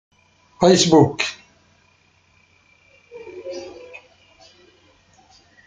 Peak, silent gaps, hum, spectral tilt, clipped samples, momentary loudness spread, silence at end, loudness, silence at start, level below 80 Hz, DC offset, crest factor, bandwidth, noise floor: -2 dBFS; none; none; -4.5 dB/octave; under 0.1%; 28 LU; 1.95 s; -16 LUFS; 0.6 s; -58 dBFS; under 0.1%; 22 dB; 9.6 kHz; -59 dBFS